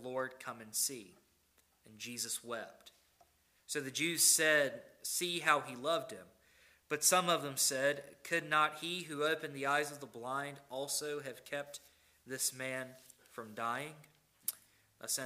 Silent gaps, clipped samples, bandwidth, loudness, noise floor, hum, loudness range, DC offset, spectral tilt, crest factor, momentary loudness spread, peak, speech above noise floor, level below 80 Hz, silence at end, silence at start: none; under 0.1%; 16 kHz; -35 LUFS; -73 dBFS; none; 9 LU; under 0.1%; -1.5 dB/octave; 26 dB; 19 LU; -12 dBFS; 36 dB; -82 dBFS; 0 s; 0 s